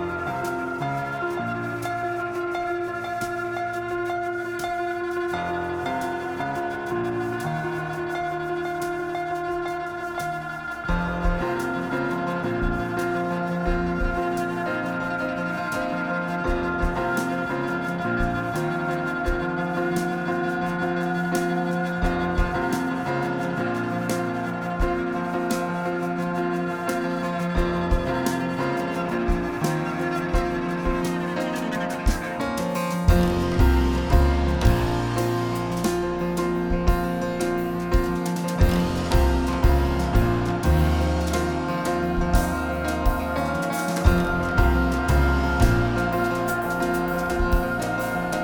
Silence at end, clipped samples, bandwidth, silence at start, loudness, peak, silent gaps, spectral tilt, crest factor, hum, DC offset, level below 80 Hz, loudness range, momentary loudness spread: 0 s; under 0.1%; over 20 kHz; 0 s; -25 LUFS; -4 dBFS; none; -6.5 dB/octave; 20 dB; none; under 0.1%; -30 dBFS; 5 LU; 7 LU